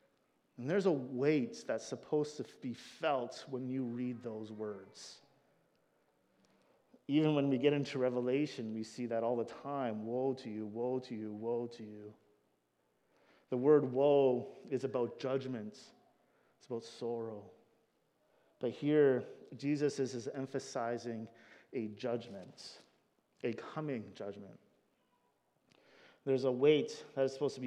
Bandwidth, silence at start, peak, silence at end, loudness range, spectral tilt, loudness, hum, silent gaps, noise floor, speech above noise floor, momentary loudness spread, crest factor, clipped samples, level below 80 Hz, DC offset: 10 kHz; 0.6 s; -16 dBFS; 0 s; 10 LU; -6.5 dB/octave; -36 LUFS; none; none; -78 dBFS; 43 dB; 17 LU; 22 dB; under 0.1%; under -90 dBFS; under 0.1%